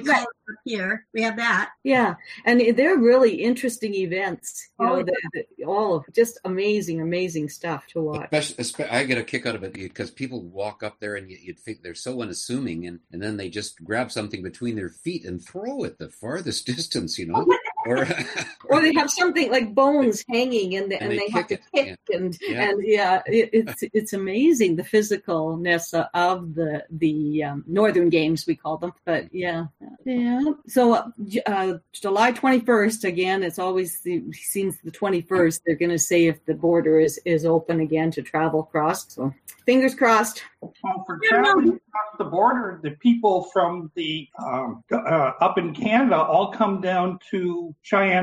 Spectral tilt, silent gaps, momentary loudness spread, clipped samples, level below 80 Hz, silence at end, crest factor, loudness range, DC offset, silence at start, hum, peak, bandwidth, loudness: -4.5 dB/octave; none; 13 LU; under 0.1%; -64 dBFS; 0 s; 16 dB; 9 LU; under 0.1%; 0 s; none; -6 dBFS; 15.5 kHz; -23 LUFS